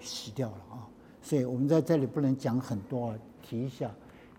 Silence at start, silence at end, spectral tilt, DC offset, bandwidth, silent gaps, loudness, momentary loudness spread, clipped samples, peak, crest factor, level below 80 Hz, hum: 0 s; 0.05 s; -7 dB/octave; under 0.1%; 16 kHz; none; -32 LUFS; 20 LU; under 0.1%; -14 dBFS; 18 dB; -66 dBFS; none